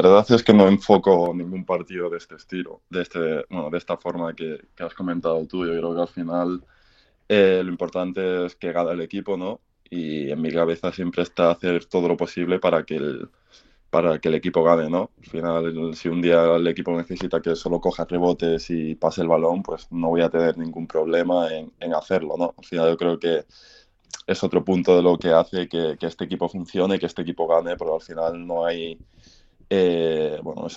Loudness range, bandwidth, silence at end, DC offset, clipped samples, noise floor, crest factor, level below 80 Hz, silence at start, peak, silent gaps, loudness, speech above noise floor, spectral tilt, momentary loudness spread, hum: 5 LU; 7.8 kHz; 0 s; under 0.1%; under 0.1%; -59 dBFS; 22 dB; -54 dBFS; 0 s; 0 dBFS; none; -22 LUFS; 37 dB; -7 dB/octave; 12 LU; none